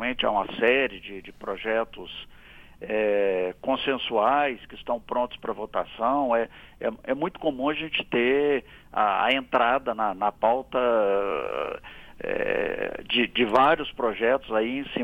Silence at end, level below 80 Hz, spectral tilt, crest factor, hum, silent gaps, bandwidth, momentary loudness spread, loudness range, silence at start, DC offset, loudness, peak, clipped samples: 0 s; -54 dBFS; -6 dB/octave; 18 dB; none; none; 9.6 kHz; 12 LU; 3 LU; 0 s; under 0.1%; -25 LUFS; -6 dBFS; under 0.1%